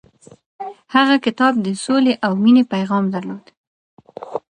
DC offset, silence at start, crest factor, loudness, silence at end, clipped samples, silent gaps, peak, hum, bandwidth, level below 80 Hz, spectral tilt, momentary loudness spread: under 0.1%; 0.6 s; 18 dB; -16 LUFS; 0.1 s; under 0.1%; 3.57-3.97 s; 0 dBFS; none; 10 kHz; -66 dBFS; -5.5 dB/octave; 20 LU